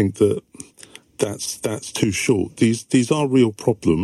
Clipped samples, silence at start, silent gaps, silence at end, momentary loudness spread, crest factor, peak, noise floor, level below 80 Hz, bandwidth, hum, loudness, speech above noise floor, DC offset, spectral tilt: under 0.1%; 0 s; none; 0 s; 16 LU; 16 dB; -4 dBFS; -46 dBFS; -54 dBFS; 13.5 kHz; none; -20 LUFS; 27 dB; under 0.1%; -5.5 dB/octave